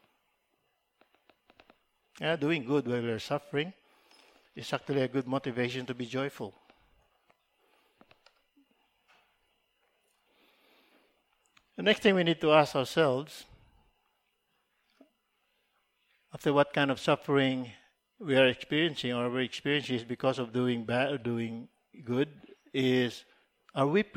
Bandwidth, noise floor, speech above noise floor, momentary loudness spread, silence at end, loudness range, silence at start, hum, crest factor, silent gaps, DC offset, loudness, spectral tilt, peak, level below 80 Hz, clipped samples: 16.5 kHz; -77 dBFS; 47 dB; 15 LU; 0.1 s; 8 LU; 2.2 s; none; 24 dB; none; under 0.1%; -30 LUFS; -6 dB/octave; -8 dBFS; -72 dBFS; under 0.1%